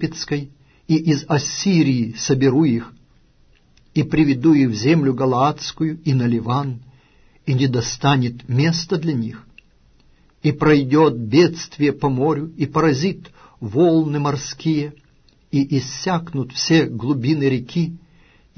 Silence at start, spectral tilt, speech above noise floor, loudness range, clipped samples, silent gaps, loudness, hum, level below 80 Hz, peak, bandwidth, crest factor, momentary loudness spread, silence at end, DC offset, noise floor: 0 s; -6 dB/octave; 37 dB; 3 LU; under 0.1%; none; -19 LUFS; none; -50 dBFS; -2 dBFS; 6.6 kHz; 16 dB; 9 LU; 0.6 s; under 0.1%; -54 dBFS